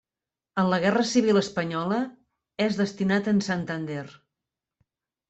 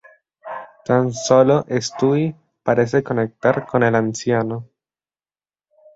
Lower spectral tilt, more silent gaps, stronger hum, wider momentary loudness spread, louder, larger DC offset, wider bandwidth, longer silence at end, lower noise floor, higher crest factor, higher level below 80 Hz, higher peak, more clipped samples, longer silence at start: about the same, -5.5 dB/octave vs -6 dB/octave; neither; neither; about the same, 13 LU vs 15 LU; second, -25 LUFS vs -19 LUFS; neither; about the same, 8.2 kHz vs 8 kHz; about the same, 1.2 s vs 1.3 s; about the same, under -90 dBFS vs under -90 dBFS; about the same, 16 dB vs 18 dB; second, -66 dBFS vs -58 dBFS; second, -10 dBFS vs -2 dBFS; neither; about the same, 0.55 s vs 0.45 s